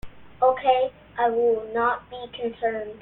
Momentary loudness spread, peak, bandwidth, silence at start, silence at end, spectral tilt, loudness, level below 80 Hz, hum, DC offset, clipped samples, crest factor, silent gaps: 11 LU; -6 dBFS; 4.1 kHz; 0.05 s; 0.05 s; -7 dB/octave; -24 LUFS; -54 dBFS; none; under 0.1%; under 0.1%; 18 dB; none